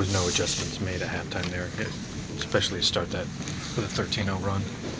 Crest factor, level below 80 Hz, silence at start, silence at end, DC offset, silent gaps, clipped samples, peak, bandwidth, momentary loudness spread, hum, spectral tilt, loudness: 22 dB; -44 dBFS; 0 s; 0 s; under 0.1%; none; under 0.1%; -8 dBFS; 8 kHz; 9 LU; none; -3.5 dB/octave; -28 LUFS